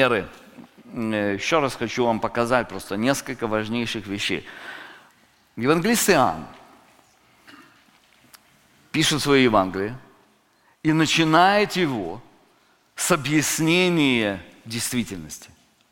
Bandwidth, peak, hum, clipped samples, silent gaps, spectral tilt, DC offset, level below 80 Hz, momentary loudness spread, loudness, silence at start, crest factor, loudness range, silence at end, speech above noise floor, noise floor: 17 kHz; -2 dBFS; none; under 0.1%; none; -4 dB/octave; under 0.1%; -52 dBFS; 20 LU; -21 LUFS; 0 s; 22 dB; 5 LU; 0.45 s; 39 dB; -61 dBFS